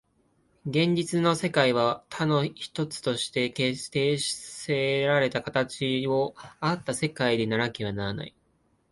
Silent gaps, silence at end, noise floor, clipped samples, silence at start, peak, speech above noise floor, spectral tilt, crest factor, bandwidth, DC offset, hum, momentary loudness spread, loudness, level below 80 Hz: none; 0.6 s; -68 dBFS; under 0.1%; 0.65 s; -6 dBFS; 42 dB; -5 dB/octave; 22 dB; 11.5 kHz; under 0.1%; none; 9 LU; -27 LUFS; -60 dBFS